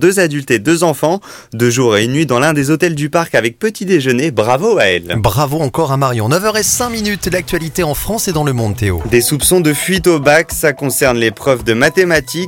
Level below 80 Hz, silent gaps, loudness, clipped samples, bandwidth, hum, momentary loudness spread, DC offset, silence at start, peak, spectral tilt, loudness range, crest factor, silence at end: -36 dBFS; none; -13 LUFS; under 0.1%; 17 kHz; none; 6 LU; under 0.1%; 0 s; 0 dBFS; -4.5 dB/octave; 3 LU; 12 dB; 0 s